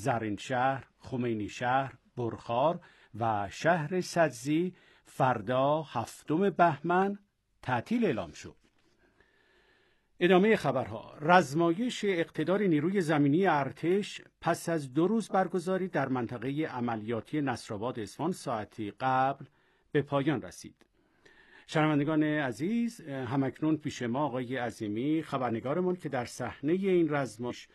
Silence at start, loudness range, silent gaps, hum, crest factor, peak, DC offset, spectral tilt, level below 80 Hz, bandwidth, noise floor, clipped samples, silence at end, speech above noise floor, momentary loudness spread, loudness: 0 s; 6 LU; none; none; 24 dB; -8 dBFS; under 0.1%; -6.5 dB/octave; -68 dBFS; 12.5 kHz; -68 dBFS; under 0.1%; 0.1 s; 38 dB; 11 LU; -30 LUFS